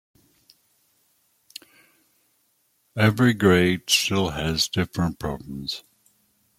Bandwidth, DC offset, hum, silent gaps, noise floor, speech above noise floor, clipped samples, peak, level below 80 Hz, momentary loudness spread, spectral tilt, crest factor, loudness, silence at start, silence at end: 16 kHz; under 0.1%; none; none; -68 dBFS; 46 dB; under 0.1%; -4 dBFS; -50 dBFS; 21 LU; -4.5 dB/octave; 20 dB; -22 LUFS; 2.95 s; 0.8 s